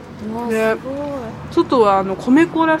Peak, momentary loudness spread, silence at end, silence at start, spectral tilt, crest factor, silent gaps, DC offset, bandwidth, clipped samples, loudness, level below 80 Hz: -2 dBFS; 12 LU; 0 s; 0 s; -6.5 dB/octave; 16 dB; none; under 0.1%; 14.5 kHz; under 0.1%; -17 LUFS; -50 dBFS